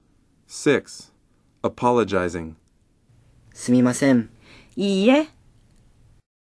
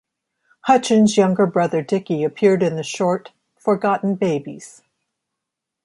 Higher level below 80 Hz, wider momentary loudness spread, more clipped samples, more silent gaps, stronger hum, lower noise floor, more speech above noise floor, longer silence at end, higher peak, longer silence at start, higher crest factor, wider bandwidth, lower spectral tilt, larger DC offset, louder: first, -56 dBFS vs -66 dBFS; first, 20 LU vs 11 LU; neither; neither; neither; second, -61 dBFS vs -82 dBFS; second, 41 dB vs 64 dB; about the same, 1.25 s vs 1.15 s; about the same, -4 dBFS vs -2 dBFS; second, 0.5 s vs 0.65 s; about the same, 20 dB vs 18 dB; about the same, 11 kHz vs 11.5 kHz; about the same, -5.5 dB/octave vs -6 dB/octave; neither; about the same, -21 LUFS vs -19 LUFS